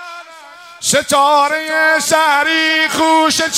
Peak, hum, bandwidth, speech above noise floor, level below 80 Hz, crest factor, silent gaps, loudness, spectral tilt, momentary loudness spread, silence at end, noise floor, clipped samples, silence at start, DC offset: 0 dBFS; none; 16 kHz; 24 dB; -56 dBFS; 14 dB; none; -12 LUFS; -1 dB/octave; 5 LU; 0 s; -37 dBFS; under 0.1%; 0 s; under 0.1%